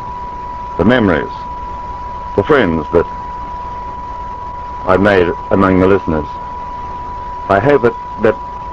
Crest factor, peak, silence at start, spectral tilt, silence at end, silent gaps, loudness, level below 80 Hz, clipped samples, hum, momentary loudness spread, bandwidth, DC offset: 16 dB; 0 dBFS; 0 s; -8 dB/octave; 0 s; none; -15 LUFS; -32 dBFS; 0.4%; none; 14 LU; 7.8 kHz; 0.4%